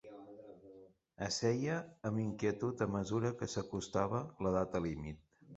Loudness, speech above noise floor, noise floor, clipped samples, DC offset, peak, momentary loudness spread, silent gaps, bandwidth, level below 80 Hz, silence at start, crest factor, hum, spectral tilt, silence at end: -38 LUFS; 23 dB; -60 dBFS; under 0.1%; under 0.1%; -18 dBFS; 19 LU; none; 8 kHz; -60 dBFS; 0.05 s; 20 dB; none; -6 dB/octave; 0 s